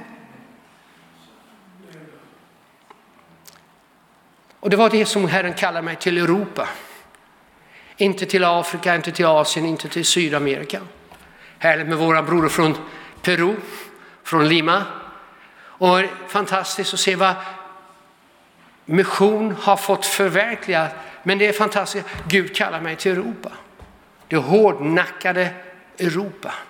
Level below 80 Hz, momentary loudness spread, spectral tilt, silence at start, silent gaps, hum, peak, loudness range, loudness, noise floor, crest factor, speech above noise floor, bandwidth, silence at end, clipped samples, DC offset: -60 dBFS; 13 LU; -4 dB/octave; 0 s; none; none; -2 dBFS; 3 LU; -19 LUFS; -55 dBFS; 20 dB; 36 dB; 18 kHz; 0.05 s; under 0.1%; under 0.1%